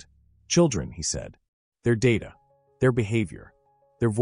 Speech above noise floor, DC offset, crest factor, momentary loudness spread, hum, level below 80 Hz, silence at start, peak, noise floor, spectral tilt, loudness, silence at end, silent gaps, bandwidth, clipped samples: 31 dB; under 0.1%; 18 dB; 13 LU; none; -48 dBFS; 0.5 s; -8 dBFS; -55 dBFS; -5.5 dB/octave; -25 LUFS; 0 s; 1.48-1.72 s; 10.5 kHz; under 0.1%